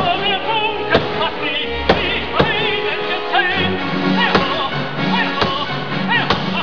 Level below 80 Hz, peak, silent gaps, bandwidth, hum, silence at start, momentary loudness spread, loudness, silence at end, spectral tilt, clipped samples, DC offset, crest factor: -40 dBFS; 0 dBFS; none; 5.4 kHz; none; 0 s; 5 LU; -17 LUFS; 0 s; -6 dB/octave; under 0.1%; 3%; 18 dB